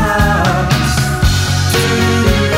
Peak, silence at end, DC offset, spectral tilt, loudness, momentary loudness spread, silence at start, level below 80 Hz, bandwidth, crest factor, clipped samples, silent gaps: 0 dBFS; 0 s; under 0.1%; -4.5 dB/octave; -13 LUFS; 2 LU; 0 s; -20 dBFS; 16.5 kHz; 12 dB; under 0.1%; none